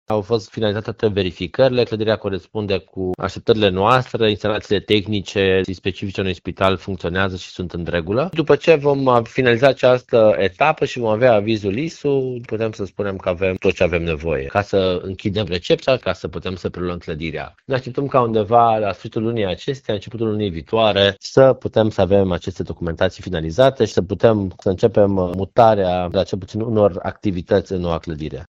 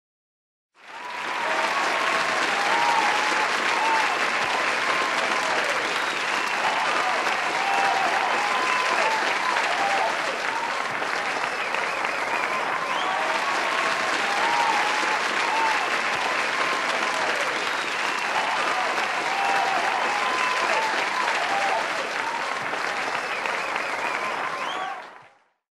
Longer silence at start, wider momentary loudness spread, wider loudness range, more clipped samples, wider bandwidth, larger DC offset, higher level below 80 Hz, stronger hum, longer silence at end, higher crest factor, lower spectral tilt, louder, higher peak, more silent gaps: second, 0.1 s vs 0.85 s; first, 11 LU vs 5 LU; about the same, 5 LU vs 3 LU; neither; second, 8 kHz vs 14 kHz; neither; first, -44 dBFS vs -72 dBFS; neither; second, 0.1 s vs 0.45 s; about the same, 18 dB vs 16 dB; first, -6.5 dB/octave vs -1 dB/octave; first, -19 LUFS vs -23 LUFS; first, 0 dBFS vs -8 dBFS; neither